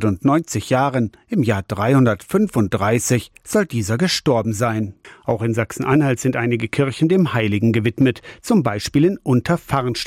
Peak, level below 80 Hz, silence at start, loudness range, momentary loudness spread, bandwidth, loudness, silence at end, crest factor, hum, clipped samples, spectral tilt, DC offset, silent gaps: -6 dBFS; -50 dBFS; 0 s; 2 LU; 5 LU; 16.5 kHz; -19 LUFS; 0 s; 12 dB; none; under 0.1%; -6 dB/octave; under 0.1%; none